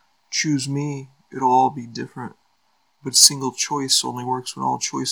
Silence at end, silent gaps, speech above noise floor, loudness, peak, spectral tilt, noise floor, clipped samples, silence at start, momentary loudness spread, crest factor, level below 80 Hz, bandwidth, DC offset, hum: 0 s; none; 45 dB; -19 LUFS; 0 dBFS; -2 dB/octave; -66 dBFS; under 0.1%; 0.3 s; 21 LU; 22 dB; -74 dBFS; over 20 kHz; under 0.1%; none